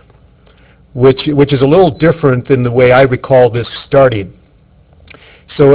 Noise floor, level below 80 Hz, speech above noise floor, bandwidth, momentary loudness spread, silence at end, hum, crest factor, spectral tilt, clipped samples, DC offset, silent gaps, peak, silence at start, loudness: -45 dBFS; -38 dBFS; 36 dB; 4 kHz; 12 LU; 0 s; none; 10 dB; -11 dB/octave; 0.8%; under 0.1%; none; 0 dBFS; 0.95 s; -10 LUFS